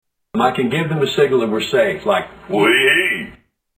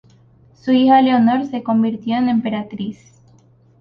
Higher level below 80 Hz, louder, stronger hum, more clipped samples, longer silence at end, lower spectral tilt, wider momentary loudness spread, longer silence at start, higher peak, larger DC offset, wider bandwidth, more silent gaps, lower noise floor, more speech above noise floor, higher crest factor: first, -52 dBFS vs -60 dBFS; about the same, -16 LUFS vs -16 LUFS; neither; neither; second, 0.45 s vs 0.85 s; second, -5 dB/octave vs -7.5 dB/octave; second, 10 LU vs 16 LU; second, 0.35 s vs 0.65 s; about the same, 0 dBFS vs -2 dBFS; neither; first, 15.5 kHz vs 6.2 kHz; neither; second, -45 dBFS vs -51 dBFS; second, 29 dB vs 35 dB; about the same, 16 dB vs 16 dB